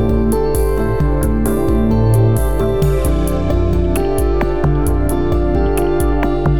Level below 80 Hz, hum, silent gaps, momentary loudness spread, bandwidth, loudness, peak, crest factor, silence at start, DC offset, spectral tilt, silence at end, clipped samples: -18 dBFS; none; none; 3 LU; 17.5 kHz; -16 LUFS; -2 dBFS; 12 dB; 0 s; 6%; -7.5 dB/octave; 0 s; under 0.1%